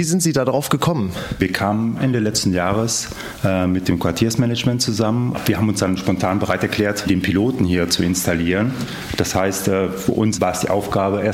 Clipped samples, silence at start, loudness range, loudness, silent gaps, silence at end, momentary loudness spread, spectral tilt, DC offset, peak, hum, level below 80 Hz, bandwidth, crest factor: under 0.1%; 0 s; 1 LU; -19 LUFS; none; 0 s; 4 LU; -5 dB/octave; under 0.1%; -2 dBFS; none; -42 dBFS; 16.5 kHz; 18 dB